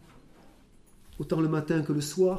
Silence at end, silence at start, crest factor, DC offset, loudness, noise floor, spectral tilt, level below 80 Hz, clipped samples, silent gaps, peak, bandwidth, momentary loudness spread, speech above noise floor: 0 s; 1.1 s; 16 dB; under 0.1%; -29 LUFS; -56 dBFS; -6.5 dB/octave; -56 dBFS; under 0.1%; none; -14 dBFS; 15.5 kHz; 6 LU; 29 dB